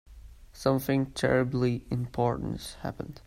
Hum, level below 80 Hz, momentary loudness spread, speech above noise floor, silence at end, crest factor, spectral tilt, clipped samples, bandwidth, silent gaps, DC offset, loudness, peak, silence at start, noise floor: none; -50 dBFS; 11 LU; 20 dB; 0.1 s; 20 dB; -6.5 dB/octave; under 0.1%; 16 kHz; none; under 0.1%; -29 LUFS; -10 dBFS; 0.1 s; -49 dBFS